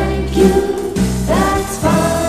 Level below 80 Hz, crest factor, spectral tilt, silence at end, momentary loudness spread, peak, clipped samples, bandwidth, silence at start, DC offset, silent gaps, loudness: -26 dBFS; 14 dB; -5.5 dB/octave; 0 s; 5 LU; 0 dBFS; under 0.1%; 13 kHz; 0 s; under 0.1%; none; -15 LUFS